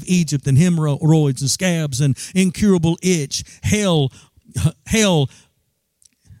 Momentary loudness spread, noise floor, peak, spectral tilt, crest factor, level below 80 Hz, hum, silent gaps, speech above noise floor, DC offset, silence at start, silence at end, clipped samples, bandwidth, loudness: 7 LU; -69 dBFS; -4 dBFS; -5.5 dB/octave; 14 dB; -46 dBFS; none; none; 52 dB; under 0.1%; 0 s; 0.05 s; under 0.1%; 15.5 kHz; -18 LUFS